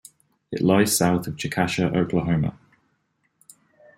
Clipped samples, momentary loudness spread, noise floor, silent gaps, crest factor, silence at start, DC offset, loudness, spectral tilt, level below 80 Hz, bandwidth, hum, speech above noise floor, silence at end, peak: under 0.1%; 9 LU; -70 dBFS; none; 20 dB; 0.5 s; under 0.1%; -22 LUFS; -5 dB/octave; -52 dBFS; 16.5 kHz; none; 49 dB; 1.45 s; -4 dBFS